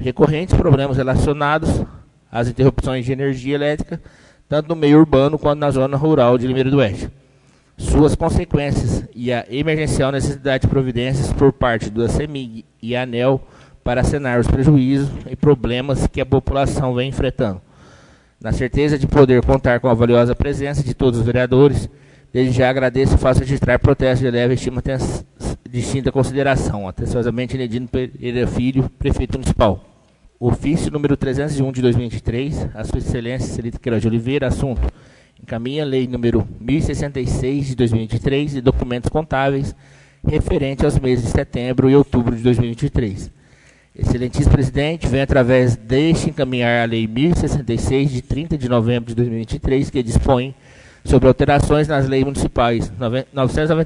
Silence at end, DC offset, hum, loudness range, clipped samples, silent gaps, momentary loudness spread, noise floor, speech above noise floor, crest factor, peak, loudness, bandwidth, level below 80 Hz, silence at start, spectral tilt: 0 s; under 0.1%; none; 5 LU; under 0.1%; none; 10 LU; -53 dBFS; 36 dB; 18 dB; 0 dBFS; -18 LUFS; 11 kHz; -30 dBFS; 0 s; -7 dB/octave